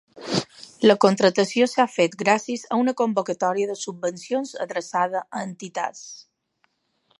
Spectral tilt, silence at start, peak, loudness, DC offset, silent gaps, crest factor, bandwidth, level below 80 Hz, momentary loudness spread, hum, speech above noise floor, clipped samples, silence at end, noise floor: -4.5 dB/octave; 0.15 s; -2 dBFS; -23 LUFS; under 0.1%; none; 22 dB; 11.5 kHz; -72 dBFS; 14 LU; none; 47 dB; under 0.1%; 1 s; -70 dBFS